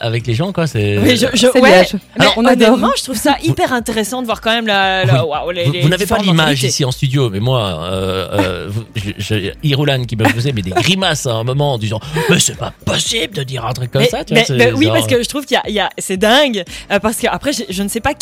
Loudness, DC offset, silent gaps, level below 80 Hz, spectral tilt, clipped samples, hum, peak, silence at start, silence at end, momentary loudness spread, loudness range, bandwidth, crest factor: -14 LUFS; under 0.1%; none; -40 dBFS; -4.5 dB/octave; under 0.1%; none; 0 dBFS; 0 s; 0.1 s; 9 LU; 5 LU; 16.5 kHz; 14 dB